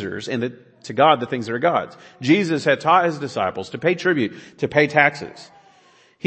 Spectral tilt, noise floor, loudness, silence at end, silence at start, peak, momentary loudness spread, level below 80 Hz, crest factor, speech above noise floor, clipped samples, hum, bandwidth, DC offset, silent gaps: -5.5 dB/octave; -54 dBFS; -20 LUFS; 0.8 s; 0 s; 0 dBFS; 13 LU; -64 dBFS; 20 dB; 34 dB; under 0.1%; none; 8.6 kHz; under 0.1%; none